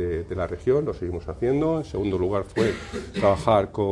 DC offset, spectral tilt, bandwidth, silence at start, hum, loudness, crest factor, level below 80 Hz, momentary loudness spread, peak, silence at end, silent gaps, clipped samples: under 0.1%; -7 dB/octave; 12 kHz; 0 s; none; -25 LUFS; 18 dB; -44 dBFS; 9 LU; -6 dBFS; 0 s; none; under 0.1%